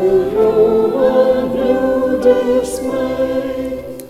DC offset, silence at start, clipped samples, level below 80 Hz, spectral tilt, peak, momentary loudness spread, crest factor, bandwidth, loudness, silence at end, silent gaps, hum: under 0.1%; 0 s; under 0.1%; -40 dBFS; -6 dB/octave; 0 dBFS; 8 LU; 14 dB; 14.5 kHz; -15 LUFS; 0 s; none; none